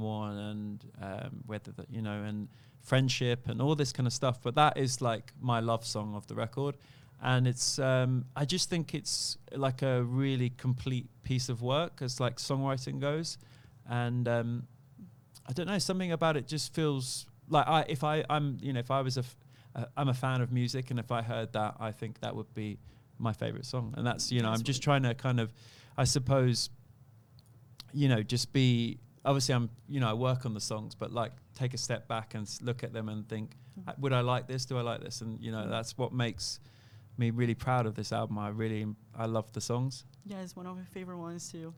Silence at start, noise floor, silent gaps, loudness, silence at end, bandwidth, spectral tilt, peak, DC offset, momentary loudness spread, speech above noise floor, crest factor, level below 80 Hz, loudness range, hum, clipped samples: 0 s; -59 dBFS; none; -33 LUFS; 0 s; 14.5 kHz; -5 dB/octave; -12 dBFS; under 0.1%; 13 LU; 26 dB; 20 dB; -62 dBFS; 5 LU; none; under 0.1%